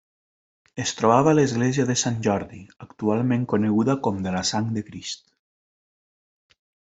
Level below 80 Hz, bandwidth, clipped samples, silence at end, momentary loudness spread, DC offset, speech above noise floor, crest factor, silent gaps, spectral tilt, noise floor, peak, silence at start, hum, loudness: -60 dBFS; 8.2 kHz; under 0.1%; 1.65 s; 15 LU; under 0.1%; over 68 dB; 20 dB; none; -5 dB/octave; under -90 dBFS; -4 dBFS; 0.75 s; none; -23 LUFS